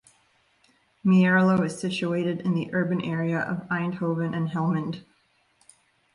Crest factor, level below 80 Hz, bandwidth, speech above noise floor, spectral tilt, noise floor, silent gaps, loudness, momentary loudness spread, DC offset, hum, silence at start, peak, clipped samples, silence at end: 16 dB; -66 dBFS; 11 kHz; 42 dB; -7 dB/octave; -66 dBFS; none; -25 LUFS; 9 LU; under 0.1%; none; 1.05 s; -10 dBFS; under 0.1%; 1.15 s